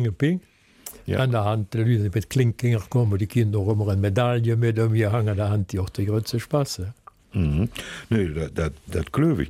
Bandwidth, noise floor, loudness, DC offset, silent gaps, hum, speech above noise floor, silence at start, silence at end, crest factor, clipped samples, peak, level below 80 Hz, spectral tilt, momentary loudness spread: 15 kHz; -44 dBFS; -24 LUFS; under 0.1%; none; none; 22 dB; 0 s; 0 s; 14 dB; under 0.1%; -8 dBFS; -42 dBFS; -7 dB/octave; 8 LU